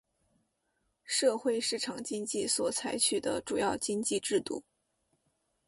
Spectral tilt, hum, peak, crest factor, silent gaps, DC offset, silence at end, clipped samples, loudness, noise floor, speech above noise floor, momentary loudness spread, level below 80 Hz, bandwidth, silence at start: -2 dB/octave; none; -14 dBFS; 18 dB; none; under 0.1%; 1.05 s; under 0.1%; -31 LUFS; -79 dBFS; 47 dB; 7 LU; -70 dBFS; 11.5 kHz; 1.05 s